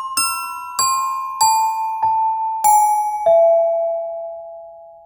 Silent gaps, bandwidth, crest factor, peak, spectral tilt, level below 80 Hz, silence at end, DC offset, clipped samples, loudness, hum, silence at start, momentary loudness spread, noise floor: none; over 20 kHz; 14 dB; -4 dBFS; 0.5 dB/octave; -60 dBFS; 0.15 s; under 0.1%; under 0.1%; -17 LUFS; none; 0 s; 15 LU; -38 dBFS